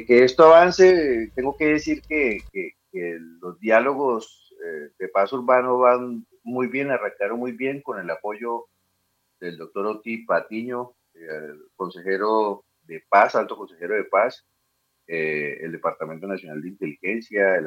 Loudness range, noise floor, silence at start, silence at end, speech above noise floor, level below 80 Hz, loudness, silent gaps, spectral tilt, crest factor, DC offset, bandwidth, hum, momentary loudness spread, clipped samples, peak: 8 LU; -72 dBFS; 0 s; 0 s; 50 dB; -58 dBFS; -21 LUFS; none; -5.5 dB/octave; 20 dB; under 0.1%; 7.6 kHz; none; 19 LU; under 0.1%; -2 dBFS